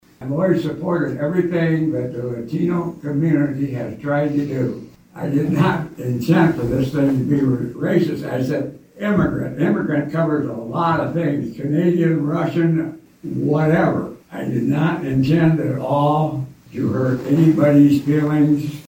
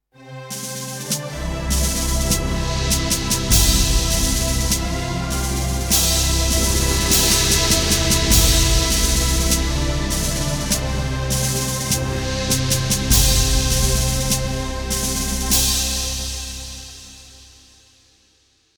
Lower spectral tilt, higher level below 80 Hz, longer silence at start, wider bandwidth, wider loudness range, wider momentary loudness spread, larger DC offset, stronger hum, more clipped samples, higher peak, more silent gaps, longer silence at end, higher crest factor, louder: first, -8.5 dB/octave vs -3 dB/octave; second, -48 dBFS vs -24 dBFS; about the same, 0.2 s vs 0.2 s; second, 17 kHz vs over 20 kHz; about the same, 4 LU vs 6 LU; about the same, 9 LU vs 11 LU; neither; neither; neither; about the same, -2 dBFS vs -2 dBFS; neither; second, 0.05 s vs 1.35 s; about the same, 16 dB vs 18 dB; about the same, -19 LUFS vs -18 LUFS